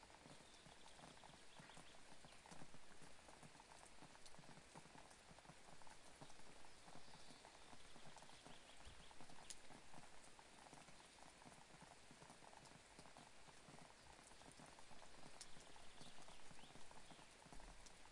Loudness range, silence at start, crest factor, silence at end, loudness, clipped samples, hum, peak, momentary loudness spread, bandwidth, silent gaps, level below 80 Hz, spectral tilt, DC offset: 1 LU; 0 s; 24 dB; 0 s; -63 LUFS; under 0.1%; none; -36 dBFS; 2 LU; 11.5 kHz; none; -74 dBFS; -2.5 dB/octave; under 0.1%